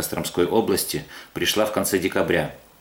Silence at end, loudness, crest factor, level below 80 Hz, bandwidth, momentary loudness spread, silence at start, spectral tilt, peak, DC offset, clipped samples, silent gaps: 0.2 s; -23 LUFS; 18 dB; -52 dBFS; 18.5 kHz; 9 LU; 0 s; -3.5 dB/octave; -6 dBFS; under 0.1%; under 0.1%; none